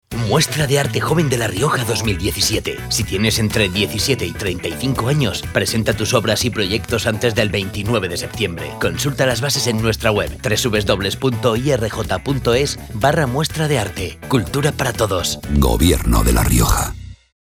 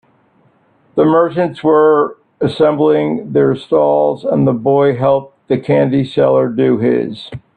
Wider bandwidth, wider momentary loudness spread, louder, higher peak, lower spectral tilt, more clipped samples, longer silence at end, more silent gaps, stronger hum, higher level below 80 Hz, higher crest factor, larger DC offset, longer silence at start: first, 19 kHz vs 8.8 kHz; about the same, 6 LU vs 8 LU; second, -18 LUFS vs -13 LUFS; about the same, 0 dBFS vs 0 dBFS; second, -4.5 dB/octave vs -9 dB/octave; neither; first, 0.35 s vs 0.2 s; neither; neither; first, -28 dBFS vs -54 dBFS; first, 18 dB vs 12 dB; neither; second, 0.1 s vs 0.95 s